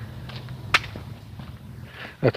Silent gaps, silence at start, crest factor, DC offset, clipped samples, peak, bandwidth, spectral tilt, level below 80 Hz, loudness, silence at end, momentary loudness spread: none; 0 s; 24 dB; under 0.1%; under 0.1%; -6 dBFS; 15.5 kHz; -5 dB/octave; -48 dBFS; -27 LUFS; 0 s; 18 LU